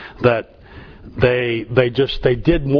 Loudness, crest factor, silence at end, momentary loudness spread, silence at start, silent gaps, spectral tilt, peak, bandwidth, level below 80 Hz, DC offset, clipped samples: -18 LUFS; 18 dB; 0 s; 7 LU; 0 s; none; -9 dB/octave; 0 dBFS; 5.4 kHz; -34 dBFS; under 0.1%; under 0.1%